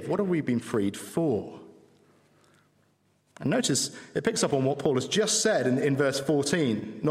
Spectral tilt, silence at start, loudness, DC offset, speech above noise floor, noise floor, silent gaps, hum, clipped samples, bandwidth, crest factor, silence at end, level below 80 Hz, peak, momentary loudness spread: -4 dB/octave; 0 s; -27 LUFS; under 0.1%; 41 dB; -68 dBFS; none; none; under 0.1%; 16 kHz; 18 dB; 0 s; -68 dBFS; -10 dBFS; 6 LU